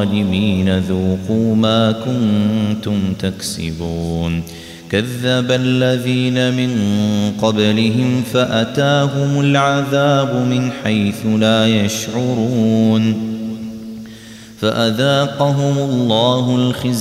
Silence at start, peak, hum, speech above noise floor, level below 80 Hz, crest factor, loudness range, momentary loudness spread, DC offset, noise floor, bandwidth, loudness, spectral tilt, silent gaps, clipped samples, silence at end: 0 s; -2 dBFS; none; 21 dB; -46 dBFS; 14 dB; 3 LU; 8 LU; under 0.1%; -36 dBFS; 15.5 kHz; -16 LUFS; -6 dB/octave; none; under 0.1%; 0 s